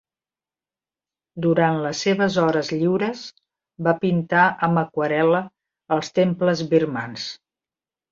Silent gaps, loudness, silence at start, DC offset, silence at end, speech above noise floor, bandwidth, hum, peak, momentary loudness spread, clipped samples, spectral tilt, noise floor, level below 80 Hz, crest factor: none; -21 LUFS; 1.35 s; under 0.1%; 0.75 s; over 70 dB; 7.6 kHz; none; -4 dBFS; 13 LU; under 0.1%; -6 dB/octave; under -90 dBFS; -64 dBFS; 18 dB